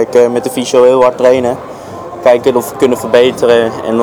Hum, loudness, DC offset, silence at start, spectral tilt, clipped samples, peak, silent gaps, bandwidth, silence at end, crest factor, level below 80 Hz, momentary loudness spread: none; -10 LUFS; under 0.1%; 0 s; -4.5 dB/octave; 0.7%; 0 dBFS; none; 18.5 kHz; 0 s; 10 dB; -48 dBFS; 11 LU